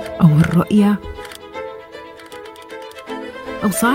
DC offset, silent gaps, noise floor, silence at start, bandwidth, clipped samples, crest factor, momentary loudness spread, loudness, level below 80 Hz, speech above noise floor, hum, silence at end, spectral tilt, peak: under 0.1%; none; -36 dBFS; 0 s; 17 kHz; under 0.1%; 18 dB; 21 LU; -16 LUFS; -44 dBFS; 23 dB; none; 0 s; -6.5 dB/octave; 0 dBFS